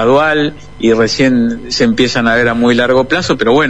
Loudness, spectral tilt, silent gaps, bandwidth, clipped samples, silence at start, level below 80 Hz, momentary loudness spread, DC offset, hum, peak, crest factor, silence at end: -11 LUFS; -5 dB/octave; none; 9.8 kHz; under 0.1%; 0 s; -38 dBFS; 5 LU; 2%; 50 Hz at -40 dBFS; 0 dBFS; 10 dB; 0 s